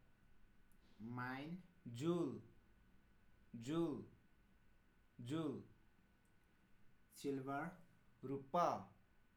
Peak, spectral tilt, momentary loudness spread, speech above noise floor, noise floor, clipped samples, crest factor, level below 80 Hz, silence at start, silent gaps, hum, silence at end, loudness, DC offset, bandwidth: -26 dBFS; -6.5 dB/octave; 17 LU; 29 dB; -73 dBFS; under 0.1%; 22 dB; -76 dBFS; 0.35 s; none; none; 0.45 s; -46 LUFS; under 0.1%; 18 kHz